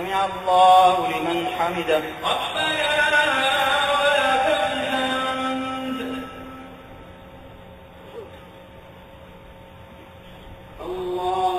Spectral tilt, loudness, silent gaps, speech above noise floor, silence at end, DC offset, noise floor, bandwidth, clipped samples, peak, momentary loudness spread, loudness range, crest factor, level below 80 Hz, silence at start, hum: -3 dB/octave; -20 LUFS; none; 24 dB; 0 s; under 0.1%; -43 dBFS; 15.5 kHz; under 0.1%; -4 dBFS; 23 LU; 23 LU; 18 dB; -52 dBFS; 0 s; none